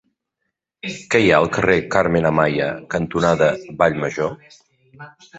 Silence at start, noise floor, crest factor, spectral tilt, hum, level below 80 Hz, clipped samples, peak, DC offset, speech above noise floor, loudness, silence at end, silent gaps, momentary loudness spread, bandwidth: 0.85 s; -78 dBFS; 18 dB; -6 dB/octave; none; -46 dBFS; under 0.1%; -2 dBFS; under 0.1%; 59 dB; -18 LUFS; 0 s; none; 10 LU; 8.2 kHz